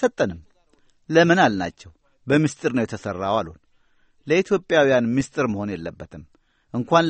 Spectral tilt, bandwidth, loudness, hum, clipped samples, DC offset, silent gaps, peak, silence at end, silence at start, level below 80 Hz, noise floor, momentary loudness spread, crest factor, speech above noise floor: -6 dB/octave; 8.8 kHz; -21 LUFS; none; under 0.1%; under 0.1%; none; -2 dBFS; 0 s; 0 s; -54 dBFS; -60 dBFS; 19 LU; 20 dB; 39 dB